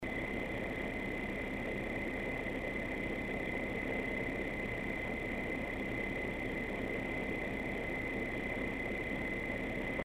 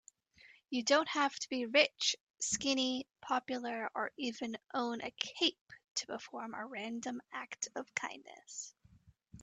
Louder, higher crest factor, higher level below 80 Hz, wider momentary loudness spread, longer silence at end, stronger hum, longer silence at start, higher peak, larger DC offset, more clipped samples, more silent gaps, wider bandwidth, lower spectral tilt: about the same, -38 LUFS vs -36 LUFS; second, 14 dB vs 24 dB; first, -50 dBFS vs -76 dBFS; second, 1 LU vs 14 LU; about the same, 0 s vs 0 s; neither; second, 0 s vs 0.45 s; second, -24 dBFS vs -14 dBFS; neither; neither; second, none vs 2.20-2.34 s, 5.61-5.66 s, 5.91-5.95 s; first, 15.5 kHz vs 9.4 kHz; first, -6.5 dB/octave vs -1 dB/octave